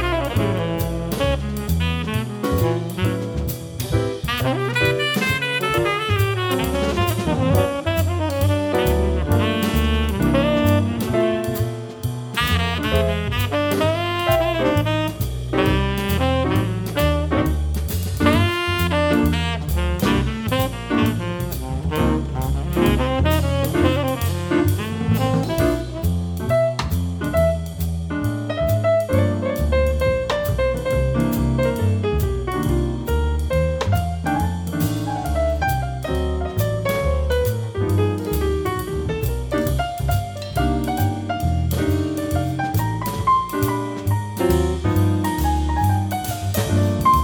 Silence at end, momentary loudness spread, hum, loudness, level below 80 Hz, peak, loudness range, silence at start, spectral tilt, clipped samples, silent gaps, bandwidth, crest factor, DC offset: 0 s; 5 LU; none; -21 LUFS; -28 dBFS; -2 dBFS; 2 LU; 0 s; -6 dB/octave; under 0.1%; none; over 20 kHz; 18 dB; under 0.1%